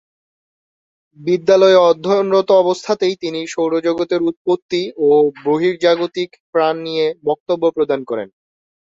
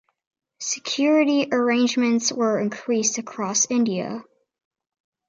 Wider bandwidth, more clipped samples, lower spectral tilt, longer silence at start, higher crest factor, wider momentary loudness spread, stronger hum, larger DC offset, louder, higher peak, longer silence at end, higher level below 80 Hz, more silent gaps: about the same, 7.8 kHz vs 7.8 kHz; neither; first, -5.5 dB/octave vs -3 dB/octave; first, 1.2 s vs 0.6 s; about the same, 16 dB vs 16 dB; about the same, 10 LU vs 9 LU; neither; neither; first, -16 LUFS vs -21 LUFS; first, 0 dBFS vs -8 dBFS; second, 0.65 s vs 1.05 s; first, -64 dBFS vs -74 dBFS; first, 4.37-4.45 s, 4.62-4.69 s, 6.40-6.53 s, 7.40-7.46 s vs none